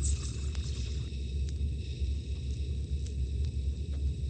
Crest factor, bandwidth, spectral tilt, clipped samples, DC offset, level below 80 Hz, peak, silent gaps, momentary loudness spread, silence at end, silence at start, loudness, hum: 14 dB; 9.4 kHz; -5.5 dB/octave; under 0.1%; under 0.1%; -34 dBFS; -20 dBFS; none; 2 LU; 0 s; 0 s; -36 LUFS; none